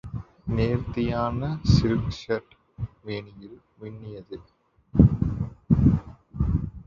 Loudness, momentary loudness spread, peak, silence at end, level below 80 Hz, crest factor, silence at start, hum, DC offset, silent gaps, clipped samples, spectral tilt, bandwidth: -25 LUFS; 20 LU; -2 dBFS; 0.05 s; -34 dBFS; 22 dB; 0.05 s; none; under 0.1%; none; under 0.1%; -8.5 dB/octave; 7.4 kHz